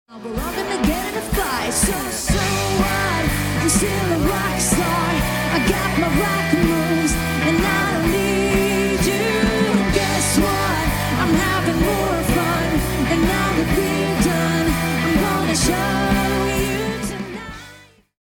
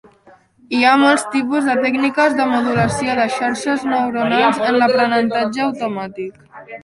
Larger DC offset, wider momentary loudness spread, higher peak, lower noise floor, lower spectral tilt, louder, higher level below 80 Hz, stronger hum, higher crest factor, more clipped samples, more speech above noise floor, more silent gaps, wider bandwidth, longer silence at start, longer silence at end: neither; second, 4 LU vs 10 LU; second, -4 dBFS vs 0 dBFS; second, -45 dBFS vs -49 dBFS; about the same, -4.5 dB/octave vs -4.5 dB/octave; second, -19 LUFS vs -16 LUFS; first, -30 dBFS vs -54 dBFS; neither; about the same, 16 dB vs 16 dB; neither; second, 24 dB vs 33 dB; neither; first, 18 kHz vs 11.5 kHz; second, 0.1 s vs 0.7 s; first, 0.45 s vs 0.05 s